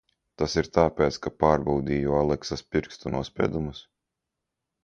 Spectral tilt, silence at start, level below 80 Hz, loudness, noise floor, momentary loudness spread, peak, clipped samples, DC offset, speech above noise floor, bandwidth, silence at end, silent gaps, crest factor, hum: -6 dB/octave; 0.4 s; -44 dBFS; -26 LUFS; -85 dBFS; 9 LU; -4 dBFS; under 0.1%; under 0.1%; 59 dB; 7.8 kHz; 1.05 s; none; 22 dB; none